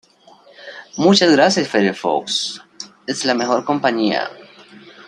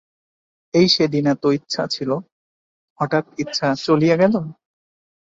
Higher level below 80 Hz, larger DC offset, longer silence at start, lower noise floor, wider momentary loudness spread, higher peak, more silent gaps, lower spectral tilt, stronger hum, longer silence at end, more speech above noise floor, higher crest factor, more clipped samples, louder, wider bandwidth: second, -66 dBFS vs -60 dBFS; neither; second, 0.6 s vs 0.75 s; second, -48 dBFS vs under -90 dBFS; first, 20 LU vs 10 LU; about the same, -2 dBFS vs -2 dBFS; second, none vs 2.32-2.96 s; second, -4 dB/octave vs -5.5 dB/octave; neither; second, 0.05 s vs 0.8 s; second, 32 dB vs over 72 dB; about the same, 18 dB vs 18 dB; neither; about the same, -17 LUFS vs -19 LUFS; first, 11 kHz vs 7.8 kHz